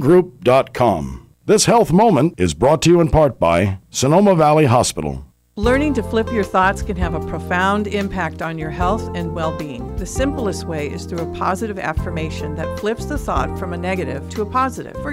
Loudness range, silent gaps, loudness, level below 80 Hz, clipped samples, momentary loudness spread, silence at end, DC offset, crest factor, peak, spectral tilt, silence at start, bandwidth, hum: 9 LU; none; -18 LUFS; -32 dBFS; under 0.1%; 12 LU; 0 s; under 0.1%; 12 dB; -4 dBFS; -5.5 dB/octave; 0 s; 16 kHz; none